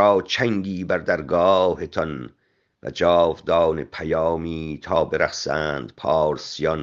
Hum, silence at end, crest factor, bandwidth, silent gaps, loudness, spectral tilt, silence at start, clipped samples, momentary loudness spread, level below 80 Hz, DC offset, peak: none; 0 s; 18 dB; 7.4 kHz; none; -22 LUFS; -5.5 dB/octave; 0 s; under 0.1%; 11 LU; -50 dBFS; under 0.1%; -2 dBFS